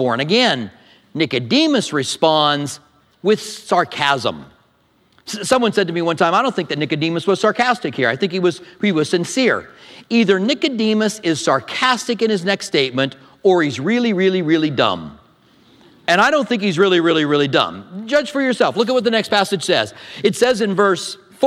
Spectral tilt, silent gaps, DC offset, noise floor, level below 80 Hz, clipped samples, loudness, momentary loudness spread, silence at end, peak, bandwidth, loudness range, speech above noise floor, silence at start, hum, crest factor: -4.5 dB/octave; none; under 0.1%; -58 dBFS; -62 dBFS; under 0.1%; -17 LUFS; 8 LU; 0 s; 0 dBFS; 14 kHz; 2 LU; 41 dB; 0 s; none; 18 dB